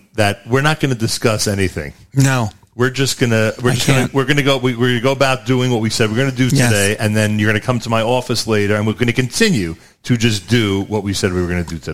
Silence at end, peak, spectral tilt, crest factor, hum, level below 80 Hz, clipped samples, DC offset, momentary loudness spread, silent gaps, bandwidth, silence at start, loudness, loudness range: 0 s; 0 dBFS; -5 dB/octave; 16 dB; none; -40 dBFS; under 0.1%; 2%; 5 LU; none; 16 kHz; 0 s; -16 LUFS; 2 LU